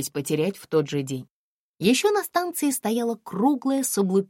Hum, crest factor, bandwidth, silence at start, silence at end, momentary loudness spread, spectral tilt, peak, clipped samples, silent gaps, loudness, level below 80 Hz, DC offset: none; 18 dB; 16.5 kHz; 0 s; 0.05 s; 7 LU; -4.5 dB/octave; -8 dBFS; under 0.1%; 1.30-1.74 s; -24 LUFS; -70 dBFS; under 0.1%